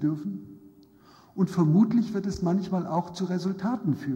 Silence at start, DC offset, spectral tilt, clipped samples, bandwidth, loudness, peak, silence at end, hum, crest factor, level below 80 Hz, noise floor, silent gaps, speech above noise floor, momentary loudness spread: 0 s; under 0.1%; -8 dB/octave; under 0.1%; 9.2 kHz; -27 LUFS; -10 dBFS; 0 s; none; 16 dB; -58 dBFS; -55 dBFS; none; 30 dB; 12 LU